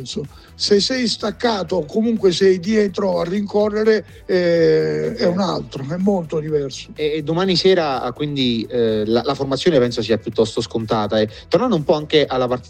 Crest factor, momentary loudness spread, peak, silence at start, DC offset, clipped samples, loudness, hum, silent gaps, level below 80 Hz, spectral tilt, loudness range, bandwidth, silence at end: 16 dB; 7 LU; -2 dBFS; 0 s; under 0.1%; under 0.1%; -18 LUFS; none; none; -48 dBFS; -5.5 dB/octave; 2 LU; 10 kHz; 0 s